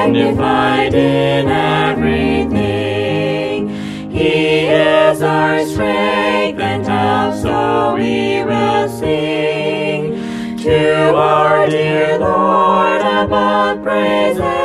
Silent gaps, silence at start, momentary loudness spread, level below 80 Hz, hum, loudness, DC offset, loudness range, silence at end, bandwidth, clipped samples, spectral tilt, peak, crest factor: none; 0 s; 6 LU; -40 dBFS; none; -14 LUFS; under 0.1%; 3 LU; 0 s; 13.5 kHz; under 0.1%; -6 dB/octave; 0 dBFS; 14 dB